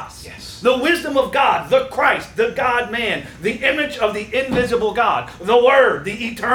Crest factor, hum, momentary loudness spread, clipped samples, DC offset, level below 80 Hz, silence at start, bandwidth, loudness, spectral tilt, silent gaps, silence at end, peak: 16 dB; none; 8 LU; under 0.1%; under 0.1%; -46 dBFS; 0 s; 18 kHz; -17 LUFS; -4 dB/octave; none; 0 s; -2 dBFS